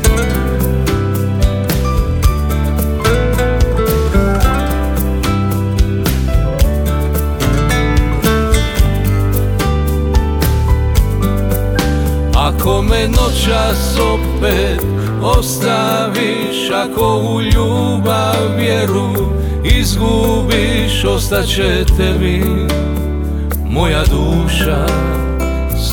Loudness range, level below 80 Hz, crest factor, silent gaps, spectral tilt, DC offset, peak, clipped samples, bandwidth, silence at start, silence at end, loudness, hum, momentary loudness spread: 1 LU; -16 dBFS; 12 dB; none; -5.5 dB/octave; under 0.1%; 0 dBFS; under 0.1%; over 20 kHz; 0 s; 0 s; -14 LUFS; none; 3 LU